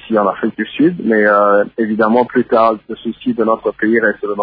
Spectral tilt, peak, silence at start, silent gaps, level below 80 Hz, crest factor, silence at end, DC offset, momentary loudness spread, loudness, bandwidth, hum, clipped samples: -9.5 dB/octave; 0 dBFS; 0 s; none; -56 dBFS; 14 dB; 0 s; under 0.1%; 9 LU; -14 LUFS; 5 kHz; none; under 0.1%